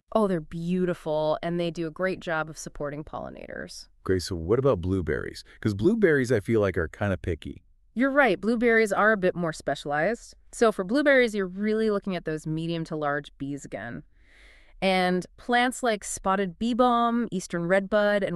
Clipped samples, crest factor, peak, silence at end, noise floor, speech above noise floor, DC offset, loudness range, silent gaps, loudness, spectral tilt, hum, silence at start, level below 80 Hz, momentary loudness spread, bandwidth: under 0.1%; 18 dB; -8 dBFS; 0 s; -54 dBFS; 28 dB; under 0.1%; 6 LU; none; -26 LUFS; -5.5 dB/octave; none; 0.15 s; -50 dBFS; 14 LU; 13 kHz